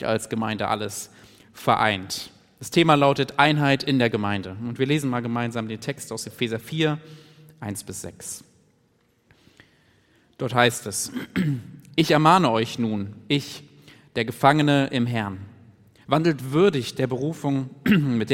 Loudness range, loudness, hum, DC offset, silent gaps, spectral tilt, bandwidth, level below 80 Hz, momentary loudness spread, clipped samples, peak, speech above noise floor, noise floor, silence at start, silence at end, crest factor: 9 LU; -23 LUFS; none; under 0.1%; none; -5 dB/octave; 16.5 kHz; -62 dBFS; 15 LU; under 0.1%; -2 dBFS; 41 dB; -64 dBFS; 0 s; 0 s; 22 dB